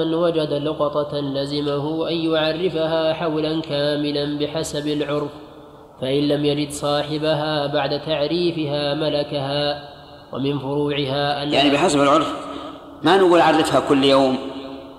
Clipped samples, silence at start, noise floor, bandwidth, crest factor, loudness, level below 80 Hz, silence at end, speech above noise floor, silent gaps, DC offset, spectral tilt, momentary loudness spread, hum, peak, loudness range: under 0.1%; 0 s; -42 dBFS; 13.5 kHz; 18 dB; -20 LUFS; -52 dBFS; 0 s; 23 dB; none; under 0.1%; -5.5 dB/octave; 10 LU; none; -2 dBFS; 6 LU